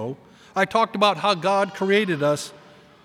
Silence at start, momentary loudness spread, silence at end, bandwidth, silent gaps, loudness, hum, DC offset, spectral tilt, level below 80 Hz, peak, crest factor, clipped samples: 0 s; 13 LU; 0.5 s; 15.5 kHz; none; -21 LUFS; none; under 0.1%; -4.5 dB/octave; -68 dBFS; -2 dBFS; 20 dB; under 0.1%